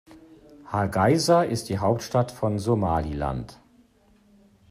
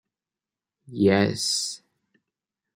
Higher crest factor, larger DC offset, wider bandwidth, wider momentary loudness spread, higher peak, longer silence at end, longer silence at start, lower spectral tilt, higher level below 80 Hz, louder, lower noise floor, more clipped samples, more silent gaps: about the same, 18 dB vs 22 dB; neither; about the same, 15 kHz vs 16 kHz; second, 10 LU vs 19 LU; about the same, -8 dBFS vs -6 dBFS; first, 1.15 s vs 1 s; second, 0.1 s vs 0.9 s; first, -6 dB/octave vs -4 dB/octave; first, -46 dBFS vs -68 dBFS; about the same, -24 LUFS vs -23 LUFS; second, -59 dBFS vs under -90 dBFS; neither; neither